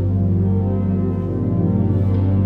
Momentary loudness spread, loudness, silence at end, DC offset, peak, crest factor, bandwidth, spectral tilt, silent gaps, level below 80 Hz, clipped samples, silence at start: 3 LU; -19 LUFS; 0 s; under 0.1%; -6 dBFS; 10 dB; 2.7 kHz; -12.5 dB/octave; none; -36 dBFS; under 0.1%; 0 s